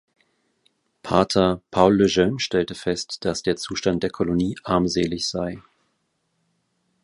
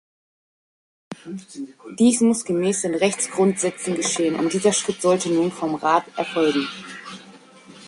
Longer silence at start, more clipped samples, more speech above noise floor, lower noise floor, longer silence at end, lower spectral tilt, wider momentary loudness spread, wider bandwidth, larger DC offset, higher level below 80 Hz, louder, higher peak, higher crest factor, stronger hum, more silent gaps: about the same, 1.05 s vs 1.1 s; neither; first, 50 dB vs 25 dB; first, -72 dBFS vs -46 dBFS; first, 1.45 s vs 0 s; about the same, -5 dB/octave vs -4 dB/octave; second, 9 LU vs 17 LU; about the same, 11.5 kHz vs 11.5 kHz; neither; first, -48 dBFS vs -64 dBFS; about the same, -22 LUFS vs -21 LUFS; about the same, -2 dBFS vs -4 dBFS; about the same, 22 dB vs 18 dB; neither; neither